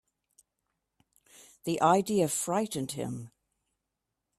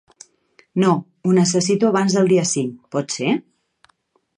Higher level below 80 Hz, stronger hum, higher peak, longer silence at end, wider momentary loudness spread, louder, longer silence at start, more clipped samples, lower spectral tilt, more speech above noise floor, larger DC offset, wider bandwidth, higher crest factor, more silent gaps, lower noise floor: second, -72 dBFS vs -66 dBFS; neither; second, -10 dBFS vs -4 dBFS; about the same, 1.1 s vs 1 s; first, 16 LU vs 9 LU; second, -29 LUFS vs -19 LUFS; first, 1.4 s vs 0.75 s; neither; about the same, -4.5 dB/octave vs -5 dB/octave; first, 57 dB vs 46 dB; neither; first, 15.5 kHz vs 10.5 kHz; first, 22 dB vs 16 dB; neither; first, -85 dBFS vs -64 dBFS